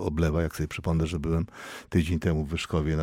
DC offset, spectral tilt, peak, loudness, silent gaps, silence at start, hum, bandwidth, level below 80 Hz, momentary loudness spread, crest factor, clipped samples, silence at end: under 0.1%; -7 dB/octave; -10 dBFS; -28 LUFS; none; 0 s; none; 16 kHz; -36 dBFS; 5 LU; 16 dB; under 0.1%; 0 s